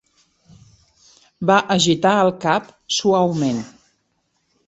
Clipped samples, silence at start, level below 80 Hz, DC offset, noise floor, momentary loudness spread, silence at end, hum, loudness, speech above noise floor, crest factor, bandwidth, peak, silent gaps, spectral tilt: under 0.1%; 1.4 s; -60 dBFS; under 0.1%; -68 dBFS; 8 LU; 1 s; none; -18 LUFS; 51 dB; 20 dB; 8.2 kHz; -2 dBFS; none; -4.5 dB/octave